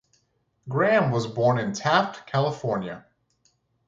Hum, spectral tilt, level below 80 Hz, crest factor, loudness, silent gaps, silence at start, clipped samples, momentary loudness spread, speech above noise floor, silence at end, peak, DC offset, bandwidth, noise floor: none; -6 dB/octave; -64 dBFS; 20 dB; -24 LUFS; none; 0.65 s; under 0.1%; 10 LU; 47 dB; 0.9 s; -6 dBFS; under 0.1%; 7.8 kHz; -70 dBFS